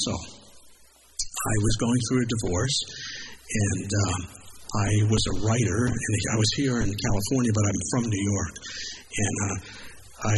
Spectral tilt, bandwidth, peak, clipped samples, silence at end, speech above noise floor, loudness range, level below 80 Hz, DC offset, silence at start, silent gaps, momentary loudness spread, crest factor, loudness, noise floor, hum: -4.5 dB/octave; 12 kHz; -10 dBFS; under 0.1%; 0 s; 29 dB; 3 LU; -42 dBFS; under 0.1%; 0 s; none; 12 LU; 16 dB; -26 LUFS; -54 dBFS; none